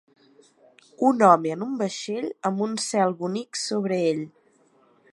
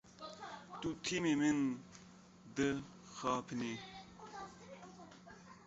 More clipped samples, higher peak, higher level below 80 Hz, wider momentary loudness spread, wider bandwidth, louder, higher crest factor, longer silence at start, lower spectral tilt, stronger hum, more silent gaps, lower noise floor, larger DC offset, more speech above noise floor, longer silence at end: neither; first, -2 dBFS vs -22 dBFS; second, -78 dBFS vs -70 dBFS; second, 12 LU vs 23 LU; first, 11.5 kHz vs 8 kHz; first, -24 LUFS vs -40 LUFS; about the same, 22 dB vs 18 dB; first, 1 s vs 0.05 s; about the same, -5 dB/octave vs -4 dB/octave; neither; neither; about the same, -61 dBFS vs -60 dBFS; neither; first, 37 dB vs 22 dB; first, 0.85 s vs 0 s